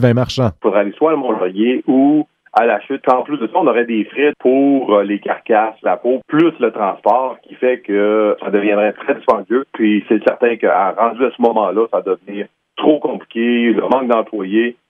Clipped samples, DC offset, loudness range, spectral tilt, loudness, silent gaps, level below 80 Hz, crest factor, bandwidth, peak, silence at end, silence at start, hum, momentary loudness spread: under 0.1%; under 0.1%; 1 LU; -7.5 dB/octave; -15 LUFS; none; -54 dBFS; 14 dB; 7.4 kHz; 0 dBFS; 0.2 s; 0 s; none; 5 LU